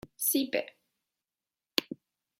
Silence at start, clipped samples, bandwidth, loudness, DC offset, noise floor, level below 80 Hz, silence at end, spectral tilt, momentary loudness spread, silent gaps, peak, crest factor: 0.2 s; under 0.1%; 16.5 kHz; -31 LUFS; under 0.1%; under -90 dBFS; -74 dBFS; 0.45 s; -1.5 dB/octave; 19 LU; none; -4 dBFS; 30 dB